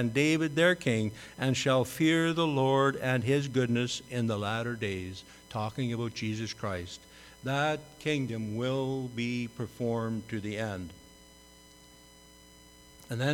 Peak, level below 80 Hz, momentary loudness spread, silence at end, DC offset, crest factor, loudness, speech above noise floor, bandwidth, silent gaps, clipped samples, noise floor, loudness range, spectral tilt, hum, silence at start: -12 dBFS; -62 dBFS; 12 LU; 0 s; under 0.1%; 18 dB; -30 LUFS; 25 dB; 18 kHz; none; under 0.1%; -55 dBFS; 10 LU; -5.5 dB/octave; none; 0 s